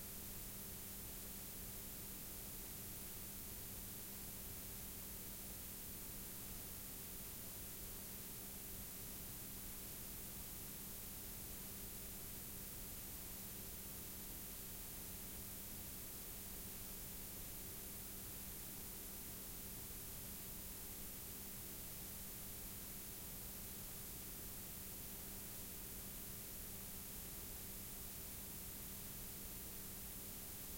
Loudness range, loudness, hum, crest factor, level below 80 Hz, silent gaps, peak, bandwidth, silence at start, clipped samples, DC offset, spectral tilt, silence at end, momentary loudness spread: 0 LU; -49 LUFS; none; 14 dB; -60 dBFS; none; -36 dBFS; 16.5 kHz; 0 s; under 0.1%; under 0.1%; -2.5 dB/octave; 0 s; 0 LU